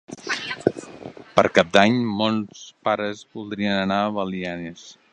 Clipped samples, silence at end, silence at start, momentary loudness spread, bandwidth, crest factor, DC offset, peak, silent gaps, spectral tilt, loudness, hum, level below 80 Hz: under 0.1%; 0.2 s; 0.1 s; 19 LU; 10 kHz; 22 dB; under 0.1%; 0 dBFS; none; -5 dB/octave; -22 LUFS; none; -56 dBFS